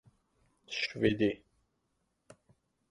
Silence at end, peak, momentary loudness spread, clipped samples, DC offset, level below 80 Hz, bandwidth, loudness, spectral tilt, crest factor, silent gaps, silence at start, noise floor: 1.55 s; -14 dBFS; 12 LU; under 0.1%; under 0.1%; -62 dBFS; 11 kHz; -32 LUFS; -5.5 dB/octave; 24 dB; none; 0.7 s; -80 dBFS